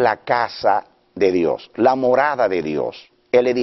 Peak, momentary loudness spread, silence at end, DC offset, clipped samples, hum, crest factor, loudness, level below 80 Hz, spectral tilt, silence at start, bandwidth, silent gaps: -2 dBFS; 6 LU; 0 s; under 0.1%; under 0.1%; none; 16 dB; -19 LUFS; -58 dBFS; -3.5 dB/octave; 0 s; 6.2 kHz; none